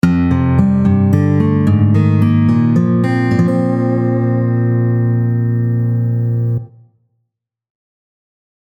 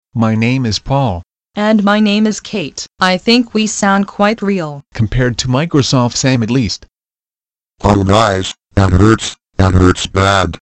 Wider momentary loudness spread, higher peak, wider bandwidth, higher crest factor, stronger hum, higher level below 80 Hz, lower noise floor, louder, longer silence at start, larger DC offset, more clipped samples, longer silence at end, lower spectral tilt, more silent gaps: second, 4 LU vs 9 LU; about the same, 0 dBFS vs 0 dBFS; second, 6 kHz vs 9.6 kHz; about the same, 14 dB vs 12 dB; neither; second, -40 dBFS vs -30 dBFS; second, -73 dBFS vs under -90 dBFS; about the same, -14 LUFS vs -13 LUFS; about the same, 0.05 s vs 0.15 s; neither; neither; first, 2.05 s vs 0.05 s; first, -10 dB/octave vs -5.5 dB/octave; neither